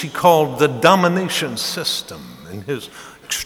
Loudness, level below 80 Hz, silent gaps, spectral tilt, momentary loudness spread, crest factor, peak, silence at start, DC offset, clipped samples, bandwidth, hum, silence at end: -17 LUFS; -56 dBFS; none; -4 dB/octave; 21 LU; 18 dB; 0 dBFS; 0 s; under 0.1%; under 0.1%; 19 kHz; none; 0 s